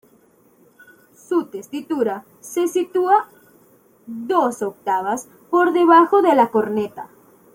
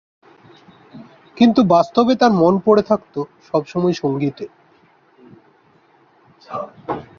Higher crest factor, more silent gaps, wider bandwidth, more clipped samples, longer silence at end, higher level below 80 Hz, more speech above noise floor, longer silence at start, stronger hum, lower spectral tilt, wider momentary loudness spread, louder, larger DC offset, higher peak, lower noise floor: about the same, 18 dB vs 18 dB; neither; first, 16.5 kHz vs 7 kHz; neither; first, 0.5 s vs 0.15 s; second, -70 dBFS vs -58 dBFS; about the same, 37 dB vs 39 dB; first, 1.3 s vs 0.95 s; neither; second, -5 dB/octave vs -7 dB/octave; first, 19 LU vs 16 LU; about the same, -19 LUFS vs -17 LUFS; neither; about the same, -2 dBFS vs -2 dBFS; about the same, -55 dBFS vs -54 dBFS